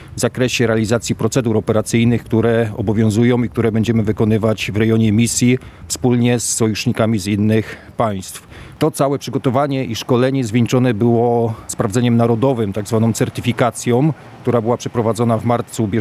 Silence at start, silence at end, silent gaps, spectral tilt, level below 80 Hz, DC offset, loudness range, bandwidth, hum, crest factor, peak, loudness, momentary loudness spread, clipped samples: 0 s; 0 s; none; -6 dB/octave; -46 dBFS; under 0.1%; 3 LU; 15 kHz; none; 14 dB; -2 dBFS; -16 LUFS; 6 LU; under 0.1%